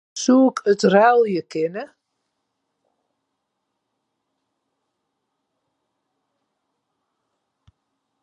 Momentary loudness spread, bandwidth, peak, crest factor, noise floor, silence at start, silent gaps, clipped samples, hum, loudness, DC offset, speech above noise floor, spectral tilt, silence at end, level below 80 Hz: 12 LU; 10.5 kHz; -2 dBFS; 22 dB; -77 dBFS; 0.15 s; none; under 0.1%; none; -17 LUFS; under 0.1%; 60 dB; -5 dB/octave; 6.4 s; -76 dBFS